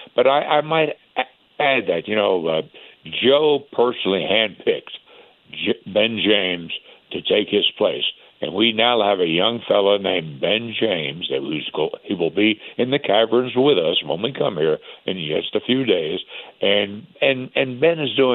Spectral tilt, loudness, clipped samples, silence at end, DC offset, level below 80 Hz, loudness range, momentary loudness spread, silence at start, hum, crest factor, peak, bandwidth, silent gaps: -8.5 dB/octave; -20 LUFS; under 0.1%; 0 s; under 0.1%; -68 dBFS; 2 LU; 10 LU; 0 s; none; 18 dB; -2 dBFS; 4.2 kHz; none